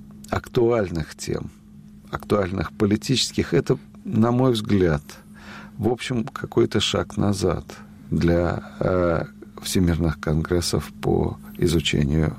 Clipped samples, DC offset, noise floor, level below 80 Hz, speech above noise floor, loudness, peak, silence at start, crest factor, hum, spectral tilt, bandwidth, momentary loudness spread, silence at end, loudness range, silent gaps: under 0.1%; under 0.1%; -45 dBFS; -40 dBFS; 23 dB; -23 LUFS; -8 dBFS; 0 s; 16 dB; none; -5.5 dB/octave; 16 kHz; 12 LU; 0 s; 2 LU; none